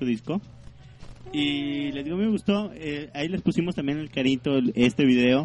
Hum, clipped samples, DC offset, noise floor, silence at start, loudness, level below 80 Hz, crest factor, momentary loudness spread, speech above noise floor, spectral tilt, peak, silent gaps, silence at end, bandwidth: none; under 0.1%; under 0.1%; -44 dBFS; 0 s; -25 LUFS; -52 dBFS; 16 dB; 12 LU; 20 dB; -6.5 dB/octave; -10 dBFS; none; 0 s; 11 kHz